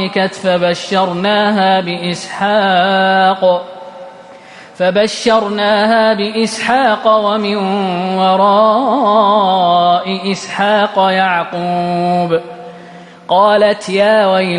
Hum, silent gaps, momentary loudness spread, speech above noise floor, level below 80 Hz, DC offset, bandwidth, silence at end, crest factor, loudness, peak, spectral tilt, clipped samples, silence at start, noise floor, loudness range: none; none; 8 LU; 24 dB; -58 dBFS; under 0.1%; 11 kHz; 0 s; 12 dB; -12 LUFS; 0 dBFS; -5 dB/octave; under 0.1%; 0 s; -36 dBFS; 3 LU